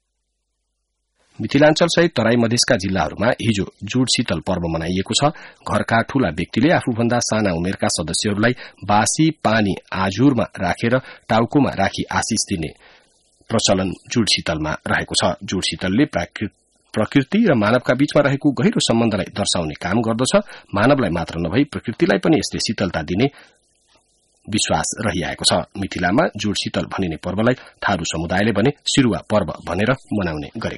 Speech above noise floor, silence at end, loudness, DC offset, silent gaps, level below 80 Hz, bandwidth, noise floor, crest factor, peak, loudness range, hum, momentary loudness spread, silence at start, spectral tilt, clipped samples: 55 dB; 0 s; -19 LUFS; under 0.1%; none; -44 dBFS; 11.5 kHz; -73 dBFS; 18 dB; -2 dBFS; 3 LU; none; 7 LU; 1.4 s; -4.5 dB/octave; under 0.1%